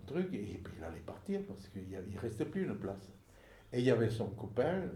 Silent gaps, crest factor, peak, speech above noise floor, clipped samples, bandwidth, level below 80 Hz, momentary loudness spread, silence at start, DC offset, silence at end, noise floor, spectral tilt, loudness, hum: none; 20 dB; -18 dBFS; 22 dB; under 0.1%; 15 kHz; -62 dBFS; 14 LU; 0 s; under 0.1%; 0 s; -60 dBFS; -7.5 dB/octave; -38 LUFS; none